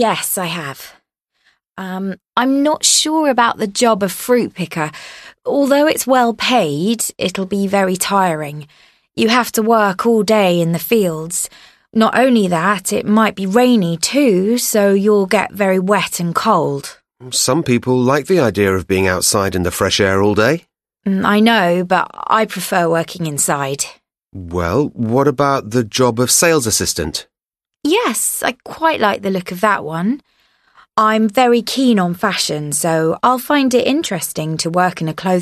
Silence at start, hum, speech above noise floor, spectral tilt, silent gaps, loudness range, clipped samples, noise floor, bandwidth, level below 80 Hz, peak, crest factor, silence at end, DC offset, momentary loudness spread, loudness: 0 s; none; 69 dB; -4 dB/octave; none; 3 LU; under 0.1%; -84 dBFS; 13.5 kHz; -48 dBFS; 0 dBFS; 16 dB; 0 s; under 0.1%; 9 LU; -15 LUFS